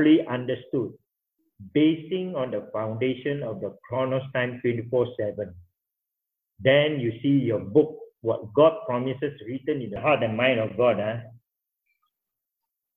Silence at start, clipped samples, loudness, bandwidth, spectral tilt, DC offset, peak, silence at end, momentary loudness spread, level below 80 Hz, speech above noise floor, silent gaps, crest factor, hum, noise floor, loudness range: 0 s; under 0.1%; -25 LUFS; 3.9 kHz; -9.5 dB/octave; under 0.1%; -6 dBFS; 1.6 s; 11 LU; -62 dBFS; 61 dB; none; 18 dB; none; -85 dBFS; 5 LU